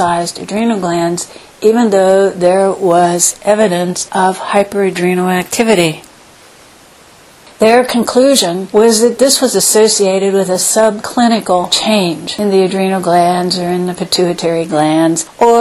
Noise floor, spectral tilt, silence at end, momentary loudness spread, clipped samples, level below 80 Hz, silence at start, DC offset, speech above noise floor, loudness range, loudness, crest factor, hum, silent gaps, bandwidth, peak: -41 dBFS; -3.5 dB/octave; 0 s; 6 LU; under 0.1%; -52 dBFS; 0 s; under 0.1%; 30 dB; 4 LU; -11 LUFS; 12 dB; none; none; 15 kHz; 0 dBFS